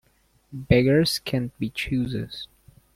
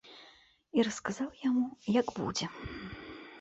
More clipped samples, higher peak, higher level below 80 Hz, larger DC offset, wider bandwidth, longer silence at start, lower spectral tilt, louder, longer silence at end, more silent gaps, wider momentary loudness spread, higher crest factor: neither; first, -4 dBFS vs -16 dBFS; first, -44 dBFS vs -60 dBFS; neither; first, 16 kHz vs 8.2 kHz; first, 0.5 s vs 0.05 s; first, -6 dB/octave vs -4.5 dB/octave; first, -23 LUFS vs -33 LUFS; first, 0.5 s vs 0 s; neither; first, 21 LU vs 16 LU; about the same, 22 dB vs 18 dB